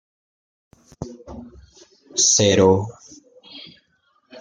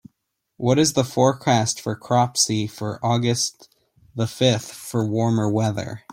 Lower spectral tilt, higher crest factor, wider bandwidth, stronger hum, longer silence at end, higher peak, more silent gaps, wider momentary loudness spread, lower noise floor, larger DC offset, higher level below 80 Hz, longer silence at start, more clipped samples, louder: second, -3 dB/octave vs -4.5 dB/octave; about the same, 20 dB vs 18 dB; second, 10.5 kHz vs 16.5 kHz; neither; second, 0 s vs 0.15 s; about the same, -2 dBFS vs -4 dBFS; neither; first, 26 LU vs 10 LU; second, -64 dBFS vs -75 dBFS; neither; about the same, -54 dBFS vs -58 dBFS; first, 1 s vs 0.6 s; neither; first, -16 LUFS vs -21 LUFS